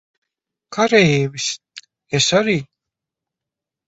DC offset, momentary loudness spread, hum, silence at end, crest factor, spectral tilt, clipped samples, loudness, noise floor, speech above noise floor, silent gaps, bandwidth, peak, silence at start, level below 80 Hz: under 0.1%; 11 LU; none; 1.25 s; 20 dB; -4 dB/octave; under 0.1%; -17 LUFS; -86 dBFS; 69 dB; none; 8.2 kHz; 0 dBFS; 0.7 s; -56 dBFS